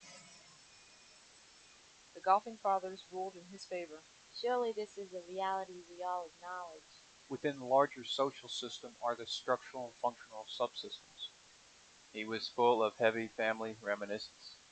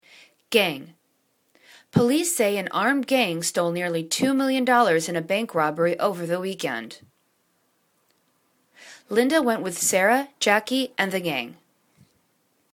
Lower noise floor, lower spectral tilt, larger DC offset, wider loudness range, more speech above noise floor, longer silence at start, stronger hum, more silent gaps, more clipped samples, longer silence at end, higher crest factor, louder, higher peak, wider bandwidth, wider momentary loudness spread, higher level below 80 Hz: second, -62 dBFS vs -69 dBFS; about the same, -3.5 dB/octave vs -3.5 dB/octave; neither; about the same, 5 LU vs 6 LU; second, 25 dB vs 46 dB; second, 0 s vs 0.5 s; neither; neither; neither; second, 0.15 s vs 1.2 s; about the same, 24 dB vs 20 dB; second, -38 LUFS vs -23 LUFS; second, -14 dBFS vs -4 dBFS; second, 9 kHz vs 19 kHz; first, 24 LU vs 8 LU; second, -82 dBFS vs -68 dBFS